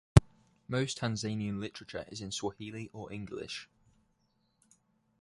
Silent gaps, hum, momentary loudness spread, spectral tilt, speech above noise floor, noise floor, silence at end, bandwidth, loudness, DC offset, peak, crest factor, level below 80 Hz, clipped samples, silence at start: none; none; 13 LU; -5.5 dB/octave; 38 dB; -75 dBFS; 1.55 s; 11.5 kHz; -35 LUFS; under 0.1%; -2 dBFS; 32 dB; -46 dBFS; under 0.1%; 0.15 s